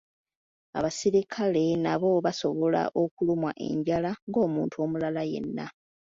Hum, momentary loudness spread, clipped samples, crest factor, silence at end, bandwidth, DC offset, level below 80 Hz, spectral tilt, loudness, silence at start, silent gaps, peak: none; 7 LU; under 0.1%; 16 dB; 0.45 s; 7.8 kHz; under 0.1%; -64 dBFS; -6 dB/octave; -28 LUFS; 0.75 s; 3.11-3.17 s, 4.22-4.27 s; -12 dBFS